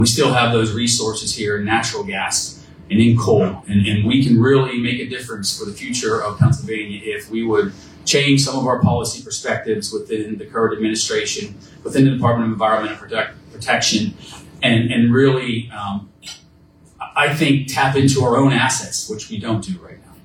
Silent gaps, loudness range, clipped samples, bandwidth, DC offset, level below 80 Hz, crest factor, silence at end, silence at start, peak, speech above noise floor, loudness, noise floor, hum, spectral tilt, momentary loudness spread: none; 3 LU; under 0.1%; 16.5 kHz; under 0.1%; -48 dBFS; 18 dB; 0.3 s; 0 s; 0 dBFS; 32 dB; -18 LUFS; -49 dBFS; none; -4.5 dB/octave; 12 LU